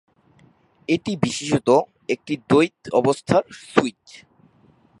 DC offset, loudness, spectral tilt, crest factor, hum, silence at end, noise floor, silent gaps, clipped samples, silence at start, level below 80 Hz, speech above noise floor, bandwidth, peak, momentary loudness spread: under 0.1%; -21 LUFS; -5.5 dB/octave; 22 dB; none; 1.1 s; -56 dBFS; none; under 0.1%; 0.9 s; -58 dBFS; 36 dB; 11.5 kHz; 0 dBFS; 9 LU